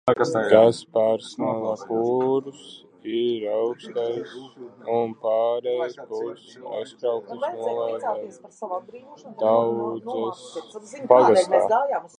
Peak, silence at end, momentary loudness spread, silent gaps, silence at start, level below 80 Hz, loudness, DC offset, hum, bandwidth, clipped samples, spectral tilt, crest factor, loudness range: -2 dBFS; 0.1 s; 21 LU; none; 0.05 s; -70 dBFS; -23 LUFS; under 0.1%; none; 10 kHz; under 0.1%; -5.5 dB/octave; 22 dB; 7 LU